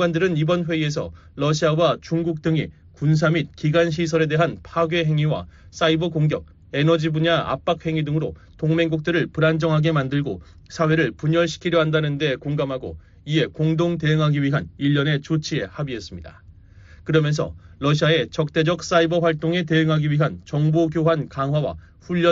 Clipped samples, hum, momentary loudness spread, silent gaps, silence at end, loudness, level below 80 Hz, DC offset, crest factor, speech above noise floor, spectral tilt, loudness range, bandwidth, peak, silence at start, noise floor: under 0.1%; none; 10 LU; none; 0 s; -21 LUFS; -48 dBFS; under 0.1%; 16 dB; 25 dB; -5.5 dB/octave; 3 LU; 7.6 kHz; -6 dBFS; 0 s; -46 dBFS